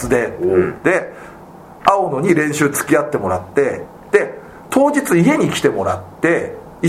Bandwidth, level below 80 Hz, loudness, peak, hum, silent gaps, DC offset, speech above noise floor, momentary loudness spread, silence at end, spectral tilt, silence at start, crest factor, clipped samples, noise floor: 16 kHz; -48 dBFS; -16 LUFS; 0 dBFS; none; none; under 0.1%; 22 dB; 11 LU; 0 s; -5.5 dB/octave; 0 s; 16 dB; under 0.1%; -38 dBFS